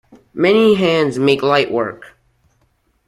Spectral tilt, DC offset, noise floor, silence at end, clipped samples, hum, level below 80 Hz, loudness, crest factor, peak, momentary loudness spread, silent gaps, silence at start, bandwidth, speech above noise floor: -6 dB/octave; under 0.1%; -61 dBFS; 1 s; under 0.1%; none; -56 dBFS; -15 LUFS; 16 dB; 0 dBFS; 10 LU; none; 0.35 s; 12.5 kHz; 47 dB